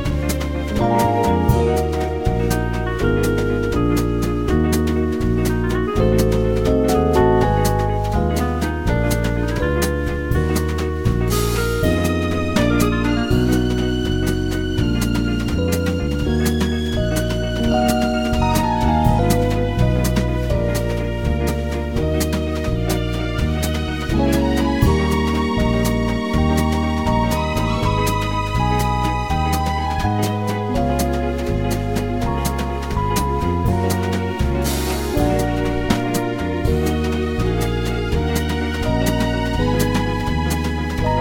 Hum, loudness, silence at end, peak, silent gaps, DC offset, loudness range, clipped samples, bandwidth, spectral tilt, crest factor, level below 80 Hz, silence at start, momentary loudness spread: none; -19 LUFS; 0 s; 0 dBFS; none; 0.7%; 3 LU; under 0.1%; 17 kHz; -6 dB/octave; 18 dB; -24 dBFS; 0 s; 5 LU